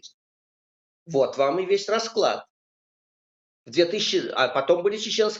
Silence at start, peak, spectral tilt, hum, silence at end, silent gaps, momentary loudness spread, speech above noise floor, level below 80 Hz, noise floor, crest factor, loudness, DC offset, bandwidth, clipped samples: 0.05 s; -6 dBFS; -3.5 dB/octave; none; 0 s; 0.14-1.06 s, 2.50-3.64 s; 4 LU; over 67 dB; -78 dBFS; under -90 dBFS; 18 dB; -24 LUFS; under 0.1%; 8 kHz; under 0.1%